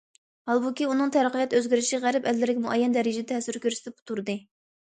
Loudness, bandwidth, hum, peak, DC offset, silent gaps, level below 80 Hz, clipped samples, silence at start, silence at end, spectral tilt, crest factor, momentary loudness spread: -26 LUFS; 9.4 kHz; none; -10 dBFS; under 0.1%; 4.02-4.06 s; -74 dBFS; under 0.1%; 0.45 s; 0.5 s; -3.5 dB/octave; 16 dB; 10 LU